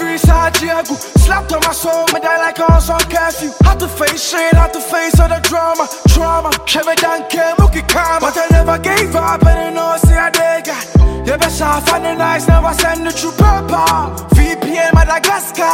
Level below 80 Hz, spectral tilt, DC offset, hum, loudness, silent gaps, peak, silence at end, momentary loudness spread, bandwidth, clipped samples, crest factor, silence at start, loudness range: -16 dBFS; -4.5 dB/octave; under 0.1%; none; -12 LUFS; none; 0 dBFS; 0 s; 4 LU; 17 kHz; under 0.1%; 12 dB; 0 s; 1 LU